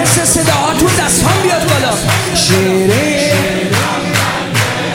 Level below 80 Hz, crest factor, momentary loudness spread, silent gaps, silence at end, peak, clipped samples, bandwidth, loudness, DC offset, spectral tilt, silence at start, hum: -34 dBFS; 12 dB; 4 LU; none; 0 s; 0 dBFS; under 0.1%; 17 kHz; -11 LUFS; under 0.1%; -3.5 dB/octave; 0 s; none